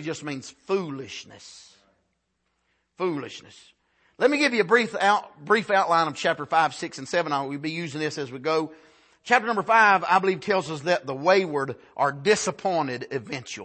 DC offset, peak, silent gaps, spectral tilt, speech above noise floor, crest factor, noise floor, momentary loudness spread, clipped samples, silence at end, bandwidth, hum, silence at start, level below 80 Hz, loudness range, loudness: under 0.1%; -4 dBFS; none; -4 dB/octave; 50 dB; 22 dB; -75 dBFS; 14 LU; under 0.1%; 0 s; 8.8 kHz; none; 0 s; -72 dBFS; 12 LU; -24 LUFS